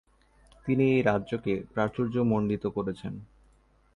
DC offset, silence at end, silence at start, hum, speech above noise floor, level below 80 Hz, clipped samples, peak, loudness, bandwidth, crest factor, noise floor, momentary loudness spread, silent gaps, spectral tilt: under 0.1%; 0.7 s; 0.65 s; none; 35 dB; -56 dBFS; under 0.1%; -10 dBFS; -28 LUFS; 10.5 kHz; 18 dB; -63 dBFS; 15 LU; none; -8.5 dB/octave